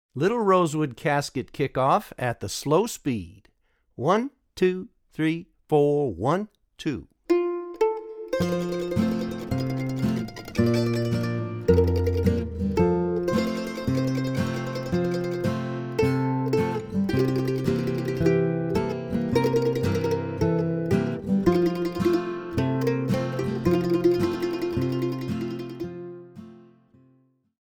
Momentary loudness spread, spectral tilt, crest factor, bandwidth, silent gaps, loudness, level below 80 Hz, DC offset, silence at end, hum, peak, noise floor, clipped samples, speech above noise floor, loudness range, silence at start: 9 LU; -7 dB/octave; 18 dB; 19 kHz; none; -25 LUFS; -46 dBFS; under 0.1%; 1.15 s; none; -6 dBFS; -63 dBFS; under 0.1%; 39 dB; 3 LU; 0.15 s